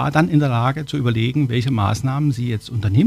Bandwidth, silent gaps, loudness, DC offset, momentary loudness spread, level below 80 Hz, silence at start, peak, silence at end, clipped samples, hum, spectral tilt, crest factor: 13.5 kHz; none; -19 LUFS; under 0.1%; 6 LU; -46 dBFS; 0 s; -4 dBFS; 0 s; under 0.1%; none; -7 dB/octave; 14 dB